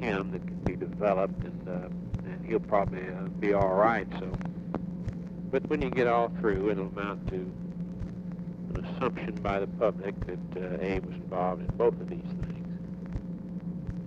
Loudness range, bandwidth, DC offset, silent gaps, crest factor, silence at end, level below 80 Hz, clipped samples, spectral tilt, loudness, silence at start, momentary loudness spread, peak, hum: 4 LU; 7 kHz; under 0.1%; none; 20 dB; 0 s; -46 dBFS; under 0.1%; -9 dB/octave; -32 LUFS; 0 s; 12 LU; -12 dBFS; none